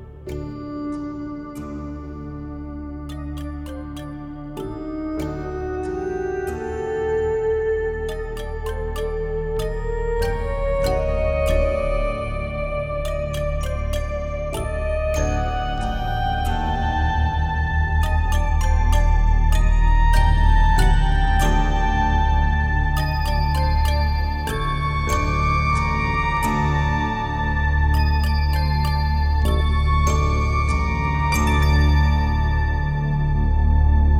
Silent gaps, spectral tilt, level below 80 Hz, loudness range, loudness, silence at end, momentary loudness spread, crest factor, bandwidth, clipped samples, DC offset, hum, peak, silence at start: none; -6.5 dB/octave; -22 dBFS; 10 LU; -22 LUFS; 0 s; 13 LU; 16 dB; 14.5 kHz; under 0.1%; under 0.1%; none; -4 dBFS; 0 s